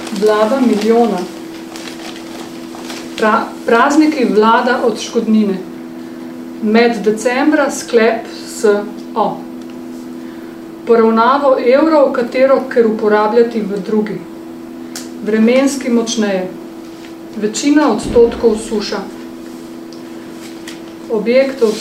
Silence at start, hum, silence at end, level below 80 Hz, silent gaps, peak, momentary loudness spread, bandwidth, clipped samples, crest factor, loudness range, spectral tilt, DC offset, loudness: 0 s; none; 0 s; -48 dBFS; none; 0 dBFS; 19 LU; 16 kHz; under 0.1%; 14 dB; 5 LU; -5 dB/octave; under 0.1%; -13 LUFS